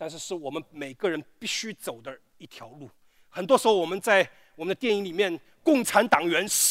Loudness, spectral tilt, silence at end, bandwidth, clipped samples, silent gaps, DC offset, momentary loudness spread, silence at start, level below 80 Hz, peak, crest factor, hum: -25 LUFS; -2.5 dB/octave; 0 s; 16 kHz; under 0.1%; none; under 0.1%; 20 LU; 0 s; -72 dBFS; -4 dBFS; 22 dB; none